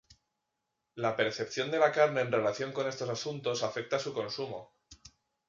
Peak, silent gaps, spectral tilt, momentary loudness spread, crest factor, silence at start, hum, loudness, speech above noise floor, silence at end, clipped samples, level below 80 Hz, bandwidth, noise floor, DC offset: -12 dBFS; none; -4 dB/octave; 10 LU; 22 dB; 0.1 s; none; -32 LUFS; 53 dB; 0.4 s; under 0.1%; -72 dBFS; 7.6 kHz; -84 dBFS; under 0.1%